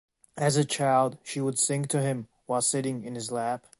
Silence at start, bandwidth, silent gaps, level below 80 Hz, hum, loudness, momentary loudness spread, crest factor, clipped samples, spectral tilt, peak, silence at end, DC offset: 0.35 s; 12 kHz; none; -70 dBFS; none; -27 LUFS; 9 LU; 18 dB; under 0.1%; -4.5 dB/octave; -10 dBFS; 0.2 s; under 0.1%